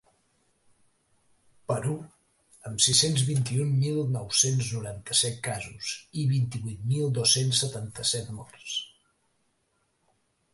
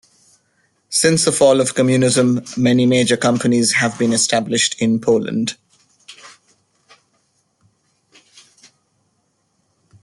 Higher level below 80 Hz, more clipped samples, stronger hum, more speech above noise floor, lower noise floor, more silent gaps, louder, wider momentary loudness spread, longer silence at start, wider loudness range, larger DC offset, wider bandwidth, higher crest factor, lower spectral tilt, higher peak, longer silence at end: about the same, -60 dBFS vs -58 dBFS; neither; neither; second, 46 dB vs 50 dB; first, -73 dBFS vs -66 dBFS; neither; second, -26 LUFS vs -15 LUFS; first, 14 LU vs 5 LU; first, 1.7 s vs 0.9 s; second, 3 LU vs 9 LU; neither; about the same, 12 kHz vs 12 kHz; first, 22 dB vs 16 dB; about the same, -3.5 dB/octave vs -4 dB/octave; second, -6 dBFS vs -2 dBFS; second, 1.65 s vs 3.75 s